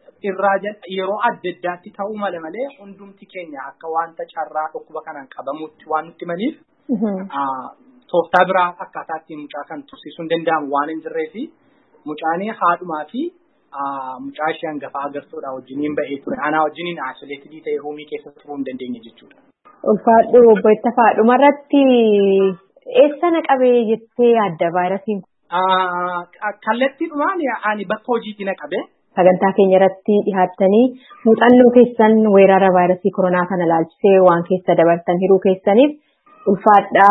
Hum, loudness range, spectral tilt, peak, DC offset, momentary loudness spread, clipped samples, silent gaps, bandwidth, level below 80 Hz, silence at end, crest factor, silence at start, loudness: none; 13 LU; -9 dB/octave; 0 dBFS; under 0.1%; 18 LU; under 0.1%; none; 4.1 kHz; -64 dBFS; 0 s; 16 dB; 0.25 s; -16 LUFS